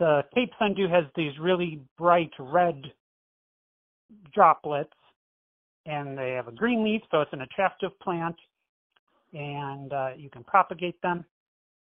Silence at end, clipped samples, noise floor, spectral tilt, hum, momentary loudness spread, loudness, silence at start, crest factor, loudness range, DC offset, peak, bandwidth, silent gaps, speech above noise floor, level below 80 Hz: 0.6 s; under 0.1%; under -90 dBFS; -9.5 dB/octave; none; 13 LU; -27 LUFS; 0 s; 22 dB; 5 LU; under 0.1%; -6 dBFS; 3.9 kHz; 1.91-1.96 s, 3.00-4.09 s, 5.16-5.84 s, 8.69-8.90 s, 8.99-9.07 s; over 64 dB; -66 dBFS